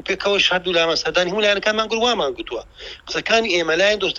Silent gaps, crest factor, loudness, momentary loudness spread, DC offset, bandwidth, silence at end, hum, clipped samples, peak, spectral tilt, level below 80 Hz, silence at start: none; 18 dB; -18 LUFS; 13 LU; under 0.1%; 10.5 kHz; 0 s; none; under 0.1%; -2 dBFS; -2.5 dB/octave; -50 dBFS; 0.05 s